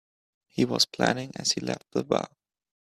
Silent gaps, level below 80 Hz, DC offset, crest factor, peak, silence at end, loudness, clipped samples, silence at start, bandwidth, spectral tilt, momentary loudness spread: none; -66 dBFS; under 0.1%; 24 dB; -6 dBFS; 0.65 s; -27 LUFS; under 0.1%; 0.55 s; 15 kHz; -3.5 dB/octave; 8 LU